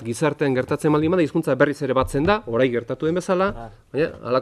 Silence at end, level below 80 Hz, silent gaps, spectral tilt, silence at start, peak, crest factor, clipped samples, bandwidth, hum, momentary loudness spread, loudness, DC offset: 0 s; -44 dBFS; none; -6.5 dB/octave; 0 s; -2 dBFS; 18 dB; under 0.1%; 13.5 kHz; none; 5 LU; -21 LUFS; under 0.1%